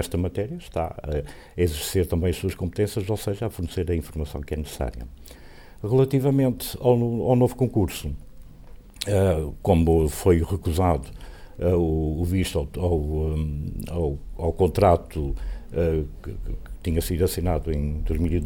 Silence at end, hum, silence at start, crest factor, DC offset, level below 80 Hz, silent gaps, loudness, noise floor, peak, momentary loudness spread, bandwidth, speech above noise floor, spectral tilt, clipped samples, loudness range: 0 s; none; 0 s; 18 dB; under 0.1%; -34 dBFS; none; -25 LUFS; -43 dBFS; -6 dBFS; 12 LU; 18 kHz; 20 dB; -7 dB/octave; under 0.1%; 4 LU